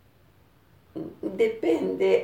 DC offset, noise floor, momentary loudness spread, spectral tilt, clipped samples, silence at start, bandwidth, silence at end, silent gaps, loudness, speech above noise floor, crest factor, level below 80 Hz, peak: under 0.1%; -59 dBFS; 16 LU; -6.5 dB/octave; under 0.1%; 0.95 s; 16 kHz; 0 s; none; -26 LUFS; 35 dB; 18 dB; -66 dBFS; -10 dBFS